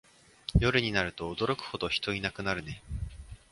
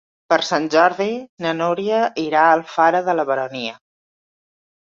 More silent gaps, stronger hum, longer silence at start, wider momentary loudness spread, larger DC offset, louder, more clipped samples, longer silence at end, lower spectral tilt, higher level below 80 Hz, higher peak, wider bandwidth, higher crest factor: second, none vs 1.29-1.37 s; neither; first, 0.5 s vs 0.3 s; first, 15 LU vs 9 LU; neither; second, -31 LUFS vs -18 LUFS; neither; second, 0.15 s vs 1.1 s; about the same, -5.5 dB/octave vs -4.5 dB/octave; first, -42 dBFS vs -68 dBFS; second, -10 dBFS vs -2 dBFS; first, 11.5 kHz vs 7.6 kHz; about the same, 22 dB vs 18 dB